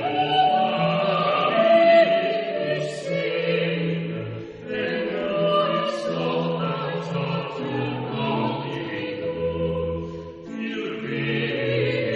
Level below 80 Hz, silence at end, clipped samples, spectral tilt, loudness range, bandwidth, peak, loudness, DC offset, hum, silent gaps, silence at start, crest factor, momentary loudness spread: -54 dBFS; 0 s; under 0.1%; -6.5 dB/octave; 7 LU; 8.8 kHz; -6 dBFS; -23 LUFS; under 0.1%; none; none; 0 s; 18 dB; 10 LU